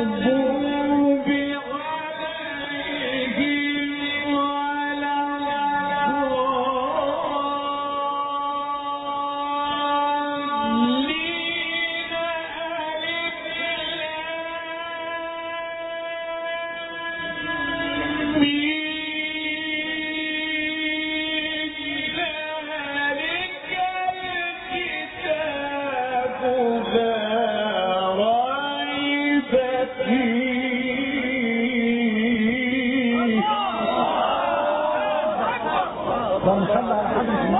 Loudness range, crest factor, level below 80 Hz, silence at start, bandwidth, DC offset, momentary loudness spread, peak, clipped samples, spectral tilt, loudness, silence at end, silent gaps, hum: 5 LU; 16 dB; -54 dBFS; 0 s; 4.1 kHz; under 0.1%; 7 LU; -6 dBFS; under 0.1%; -8 dB/octave; -23 LUFS; 0 s; none; none